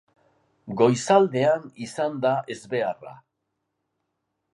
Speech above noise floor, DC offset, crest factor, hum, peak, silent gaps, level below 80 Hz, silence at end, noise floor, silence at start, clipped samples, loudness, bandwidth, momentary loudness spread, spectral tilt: 56 dB; under 0.1%; 20 dB; none; -6 dBFS; none; -72 dBFS; 1.4 s; -79 dBFS; 0.65 s; under 0.1%; -23 LUFS; 11.5 kHz; 14 LU; -5.5 dB/octave